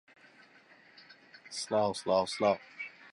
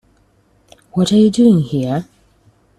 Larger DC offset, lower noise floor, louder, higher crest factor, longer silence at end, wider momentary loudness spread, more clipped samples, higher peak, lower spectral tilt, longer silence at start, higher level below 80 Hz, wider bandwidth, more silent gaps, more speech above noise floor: neither; first, -60 dBFS vs -55 dBFS; second, -32 LUFS vs -14 LUFS; about the same, 20 dB vs 16 dB; second, 0.05 s vs 0.75 s; first, 17 LU vs 12 LU; neither; second, -16 dBFS vs -2 dBFS; second, -4 dB/octave vs -7 dB/octave; first, 1.1 s vs 0.95 s; second, -72 dBFS vs -52 dBFS; about the same, 11.5 kHz vs 12 kHz; neither; second, 30 dB vs 43 dB